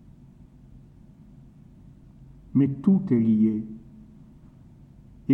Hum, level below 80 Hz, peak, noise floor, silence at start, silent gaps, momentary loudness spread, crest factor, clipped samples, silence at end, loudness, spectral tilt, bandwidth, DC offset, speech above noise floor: none; -56 dBFS; -8 dBFS; -50 dBFS; 2.55 s; none; 18 LU; 18 dB; under 0.1%; 0 s; -23 LUFS; -11.5 dB/octave; 3.3 kHz; under 0.1%; 28 dB